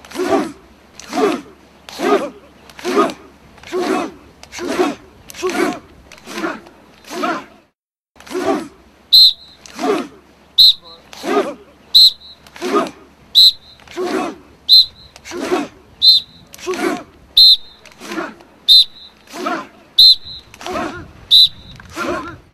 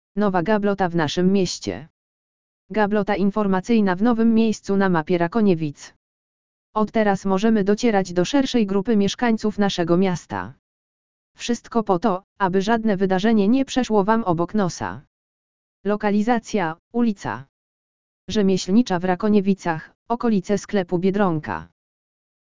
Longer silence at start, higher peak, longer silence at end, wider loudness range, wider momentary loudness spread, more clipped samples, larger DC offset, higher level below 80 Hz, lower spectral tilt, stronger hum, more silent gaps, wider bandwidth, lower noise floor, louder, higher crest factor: about the same, 0.1 s vs 0.15 s; first, 0 dBFS vs -4 dBFS; second, 0.15 s vs 0.7 s; first, 12 LU vs 4 LU; first, 23 LU vs 10 LU; first, 0.1% vs under 0.1%; second, under 0.1% vs 2%; about the same, -52 dBFS vs -50 dBFS; second, -2 dB/octave vs -6 dB/octave; neither; second, 7.75-7.88 s, 8.10-8.14 s vs 1.90-2.69 s, 5.96-6.73 s, 10.59-11.35 s, 12.24-12.36 s, 15.07-15.84 s, 16.79-16.91 s, 17.49-18.28 s, 19.95-20.06 s; first, over 20 kHz vs 7.6 kHz; second, -66 dBFS vs under -90 dBFS; first, -12 LUFS vs -21 LUFS; about the same, 16 dB vs 18 dB